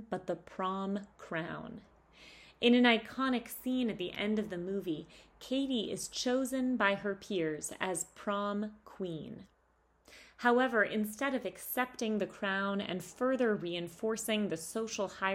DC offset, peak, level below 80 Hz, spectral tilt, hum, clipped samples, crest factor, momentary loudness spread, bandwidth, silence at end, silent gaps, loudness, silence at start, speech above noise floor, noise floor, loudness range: under 0.1%; -12 dBFS; -68 dBFS; -4 dB/octave; none; under 0.1%; 22 dB; 12 LU; 16 kHz; 0 s; none; -34 LUFS; 0 s; 37 dB; -71 dBFS; 4 LU